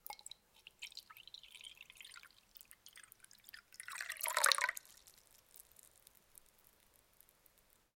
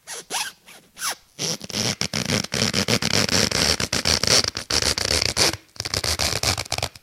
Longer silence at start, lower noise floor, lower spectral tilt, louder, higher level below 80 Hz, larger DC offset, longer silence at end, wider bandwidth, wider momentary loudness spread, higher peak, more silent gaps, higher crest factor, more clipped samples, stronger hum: about the same, 0.1 s vs 0.05 s; first, -71 dBFS vs -47 dBFS; second, 3 dB/octave vs -2 dB/octave; second, -38 LUFS vs -21 LUFS; second, -80 dBFS vs -42 dBFS; neither; first, 2.4 s vs 0.15 s; about the same, 16.5 kHz vs 17 kHz; first, 28 LU vs 10 LU; second, -8 dBFS vs 0 dBFS; neither; first, 38 dB vs 22 dB; neither; neither